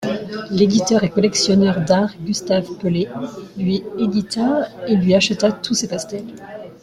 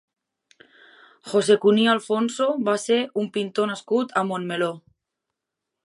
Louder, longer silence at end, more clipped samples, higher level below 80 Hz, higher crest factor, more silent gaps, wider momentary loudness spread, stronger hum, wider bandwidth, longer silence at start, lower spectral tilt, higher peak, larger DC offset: first, -18 LUFS vs -22 LUFS; second, 0.05 s vs 1.05 s; neither; first, -52 dBFS vs -76 dBFS; about the same, 16 dB vs 20 dB; neither; first, 13 LU vs 9 LU; neither; about the same, 12.5 kHz vs 11.5 kHz; second, 0 s vs 1.25 s; about the same, -5 dB/octave vs -4.5 dB/octave; about the same, -2 dBFS vs -4 dBFS; neither